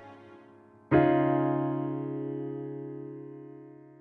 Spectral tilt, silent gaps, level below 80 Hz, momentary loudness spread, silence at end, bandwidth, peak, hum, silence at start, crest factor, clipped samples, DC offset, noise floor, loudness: -11 dB/octave; none; -60 dBFS; 22 LU; 0.1 s; 4.2 kHz; -10 dBFS; none; 0 s; 20 dB; under 0.1%; under 0.1%; -55 dBFS; -29 LUFS